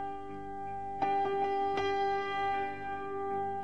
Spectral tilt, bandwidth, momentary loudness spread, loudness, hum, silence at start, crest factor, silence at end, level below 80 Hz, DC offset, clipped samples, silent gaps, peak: -5.5 dB/octave; 9 kHz; 10 LU; -34 LUFS; 50 Hz at -65 dBFS; 0 s; 14 dB; 0 s; -62 dBFS; 0.4%; under 0.1%; none; -20 dBFS